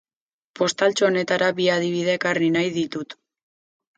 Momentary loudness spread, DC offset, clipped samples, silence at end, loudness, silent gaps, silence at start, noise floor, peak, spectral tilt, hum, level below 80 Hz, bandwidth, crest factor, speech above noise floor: 8 LU; under 0.1%; under 0.1%; 0.85 s; -21 LUFS; none; 0.55 s; under -90 dBFS; -6 dBFS; -4.5 dB/octave; none; -68 dBFS; 9.2 kHz; 16 dB; over 69 dB